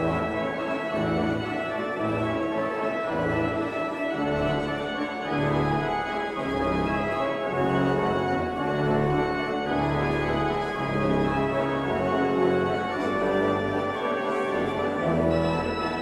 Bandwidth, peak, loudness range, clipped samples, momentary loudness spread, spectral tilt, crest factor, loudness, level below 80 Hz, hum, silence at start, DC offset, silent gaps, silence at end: 12.5 kHz; -12 dBFS; 2 LU; under 0.1%; 5 LU; -7 dB/octave; 14 dB; -26 LUFS; -46 dBFS; none; 0 s; under 0.1%; none; 0 s